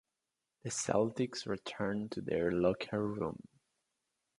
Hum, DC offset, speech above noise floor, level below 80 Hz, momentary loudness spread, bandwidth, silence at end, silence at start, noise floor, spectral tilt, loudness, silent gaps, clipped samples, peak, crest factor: none; under 0.1%; 54 dB; -64 dBFS; 8 LU; 11.5 kHz; 1 s; 0.65 s; -89 dBFS; -5 dB/octave; -36 LUFS; none; under 0.1%; -14 dBFS; 22 dB